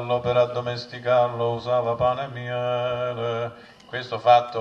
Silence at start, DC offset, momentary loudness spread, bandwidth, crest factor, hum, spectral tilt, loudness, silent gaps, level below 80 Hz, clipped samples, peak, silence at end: 0 s; under 0.1%; 12 LU; 7 kHz; 20 dB; none; -6.5 dB/octave; -24 LUFS; none; -56 dBFS; under 0.1%; -4 dBFS; 0 s